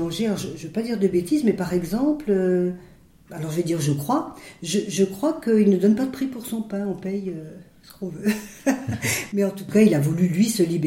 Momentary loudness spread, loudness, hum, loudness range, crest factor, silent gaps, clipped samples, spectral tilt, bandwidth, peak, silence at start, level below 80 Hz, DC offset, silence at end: 12 LU; -23 LUFS; none; 4 LU; 18 dB; none; under 0.1%; -6 dB/octave; 16.5 kHz; -4 dBFS; 0 s; -54 dBFS; under 0.1%; 0 s